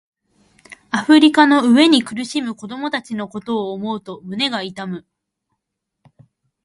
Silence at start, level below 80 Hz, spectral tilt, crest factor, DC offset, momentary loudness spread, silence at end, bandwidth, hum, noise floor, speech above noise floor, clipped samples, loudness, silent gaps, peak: 0.7 s; -64 dBFS; -4 dB/octave; 18 dB; under 0.1%; 17 LU; 1.65 s; 11.5 kHz; none; -78 dBFS; 62 dB; under 0.1%; -17 LUFS; none; 0 dBFS